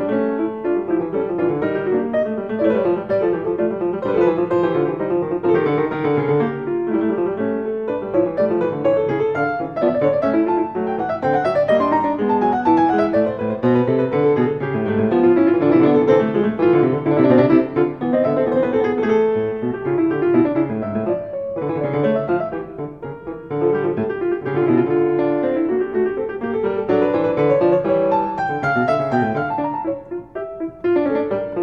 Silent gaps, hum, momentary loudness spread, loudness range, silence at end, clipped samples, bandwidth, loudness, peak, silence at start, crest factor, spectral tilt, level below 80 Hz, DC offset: none; none; 7 LU; 5 LU; 0 s; under 0.1%; 5.8 kHz; -19 LUFS; -2 dBFS; 0 s; 16 dB; -9.5 dB/octave; -52 dBFS; 0.1%